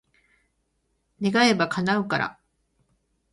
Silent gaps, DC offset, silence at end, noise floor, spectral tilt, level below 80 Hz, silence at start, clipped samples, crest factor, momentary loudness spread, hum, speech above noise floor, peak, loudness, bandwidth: none; under 0.1%; 1 s; -73 dBFS; -5 dB/octave; -64 dBFS; 1.2 s; under 0.1%; 22 dB; 9 LU; none; 50 dB; -6 dBFS; -23 LUFS; 11.5 kHz